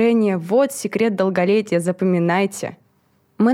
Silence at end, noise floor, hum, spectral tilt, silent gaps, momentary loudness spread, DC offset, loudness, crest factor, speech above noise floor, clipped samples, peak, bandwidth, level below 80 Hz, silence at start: 0 s; -61 dBFS; none; -6 dB/octave; none; 5 LU; under 0.1%; -19 LUFS; 14 dB; 43 dB; under 0.1%; -4 dBFS; 16 kHz; -70 dBFS; 0 s